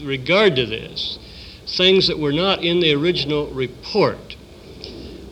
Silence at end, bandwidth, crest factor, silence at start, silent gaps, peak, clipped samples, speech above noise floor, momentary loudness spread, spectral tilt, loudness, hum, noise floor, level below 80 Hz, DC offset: 0 s; 10 kHz; 18 dB; 0 s; none; -2 dBFS; under 0.1%; 20 dB; 21 LU; -5.5 dB/octave; -18 LUFS; none; -39 dBFS; -44 dBFS; under 0.1%